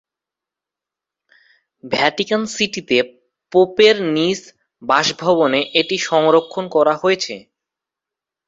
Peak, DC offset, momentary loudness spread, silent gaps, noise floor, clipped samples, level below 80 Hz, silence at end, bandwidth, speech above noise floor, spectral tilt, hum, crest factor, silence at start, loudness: 0 dBFS; under 0.1%; 9 LU; none; -87 dBFS; under 0.1%; -62 dBFS; 1.1 s; 8 kHz; 70 dB; -3.5 dB/octave; none; 18 dB; 1.85 s; -17 LUFS